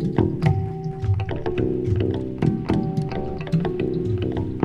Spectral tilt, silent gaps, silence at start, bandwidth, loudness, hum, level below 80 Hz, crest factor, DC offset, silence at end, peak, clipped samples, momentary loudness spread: -9.5 dB/octave; none; 0 s; 8.6 kHz; -24 LUFS; none; -38 dBFS; 18 dB; under 0.1%; 0 s; -4 dBFS; under 0.1%; 4 LU